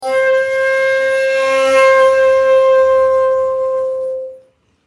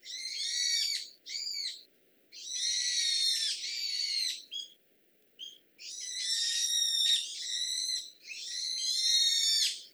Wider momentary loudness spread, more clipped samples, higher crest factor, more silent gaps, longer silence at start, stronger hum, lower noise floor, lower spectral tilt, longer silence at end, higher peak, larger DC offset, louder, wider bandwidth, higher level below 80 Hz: second, 10 LU vs 18 LU; neither; second, 12 dB vs 18 dB; neither; about the same, 0 s vs 0.05 s; neither; second, -48 dBFS vs -68 dBFS; first, -2 dB/octave vs 6 dB/octave; first, 0.5 s vs 0.05 s; first, -2 dBFS vs -16 dBFS; neither; first, -12 LUFS vs -29 LUFS; second, 11 kHz vs over 20 kHz; first, -56 dBFS vs under -90 dBFS